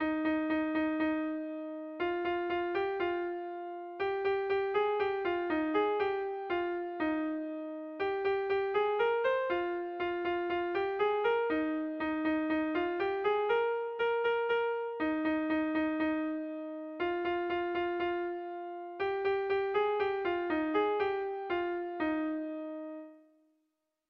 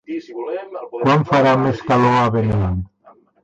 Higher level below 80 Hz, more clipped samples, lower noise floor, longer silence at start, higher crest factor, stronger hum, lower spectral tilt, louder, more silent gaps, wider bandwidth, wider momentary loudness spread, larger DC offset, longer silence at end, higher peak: second, -66 dBFS vs -38 dBFS; neither; first, -82 dBFS vs -51 dBFS; about the same, 0 s vs 0.1 s; about the same, 14 dB vs 12 dB; neither; about the same, -7 dB/octave vs -7.5 dB/octave; second, -33 LUFS vs -17 LUFS; neither; second, 5.6 kHz vs 8.2 kHz; second, 8 LU vs 14 LU; neither; first, 0.9 s vs 0.6 s; second, -20 dBFS vs -6 dBFS